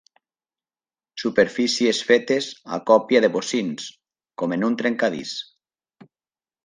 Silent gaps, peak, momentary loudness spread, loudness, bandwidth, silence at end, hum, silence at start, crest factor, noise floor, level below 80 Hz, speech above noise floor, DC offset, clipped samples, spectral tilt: none; -2 dBFS; 15 LU; -21 LUFS; 10 kHz; 1.25 s; none; 1.15 s; 22 dB; under -90 dBFS; -68 dBFS; over 69 dB; under 0.1%; under 0.1%; -4 dB/octave